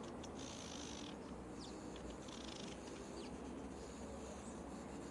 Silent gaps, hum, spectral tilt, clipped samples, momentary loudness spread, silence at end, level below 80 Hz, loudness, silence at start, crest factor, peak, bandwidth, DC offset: none; none; -4.5 dB/octave; under 0.1%; 2 LU; 0 s; -62 dBFS; -51 LUFS; 0 s; 14 dB; -36 dBFS; 11.5 kHz; under 0.1%